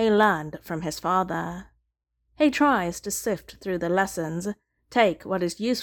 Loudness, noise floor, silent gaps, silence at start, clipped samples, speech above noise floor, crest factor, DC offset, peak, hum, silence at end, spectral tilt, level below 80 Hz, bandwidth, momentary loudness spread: -25 LUFS; -76 dBFS; none; 0 s; under 0.1%; 52 dB; 18 dB; under 0.1%; -6 dBFS; none; 0 s; -4.5 dB/octave; -56 dBFS; 18 kHz; 12 LU